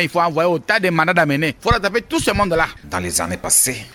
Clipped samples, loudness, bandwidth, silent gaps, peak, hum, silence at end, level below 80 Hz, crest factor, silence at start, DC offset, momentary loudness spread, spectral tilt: under 0.1%; -17 LUFS; 17.5 kHz; none; -2 dBFS; none; 0.05 s; -36 dBFS; 16 dB; 0 s; under 0.1%; 6 LU; -3.5 dB/octave